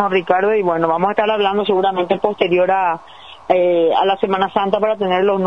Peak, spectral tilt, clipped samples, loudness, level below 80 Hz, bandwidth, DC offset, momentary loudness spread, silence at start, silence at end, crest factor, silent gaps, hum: 0 dBFS; -7.5 dB/octave; under 0.1%; -16 LUFS; -58 dBFS; 6.4 kHz; 0.4%; 3 LU; 0 s; 0 s; 16 dB; none; none